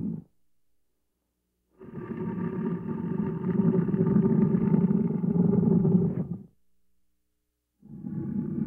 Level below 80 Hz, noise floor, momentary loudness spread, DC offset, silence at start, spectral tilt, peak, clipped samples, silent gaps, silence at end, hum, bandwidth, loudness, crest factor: -56 dBFS; -78 dBFS; 15 LU; under 0.1%; 0 s; -13 dB/octave; -10 dBFS; under 0.1%; none; 0 s; none; 2.9 kHz; -26 LUFS; 16 dB